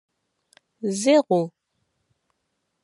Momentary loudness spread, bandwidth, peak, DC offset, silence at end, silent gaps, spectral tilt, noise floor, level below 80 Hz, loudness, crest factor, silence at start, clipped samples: 13 LU; 11.5 kHz; -6 dBFS; under 0.1%; 1.35 s; none; -5 dB/octave; -76 dBFS; -82 dBFS; -22 LUFS; 20 dB; 0.85 s; under 0.1%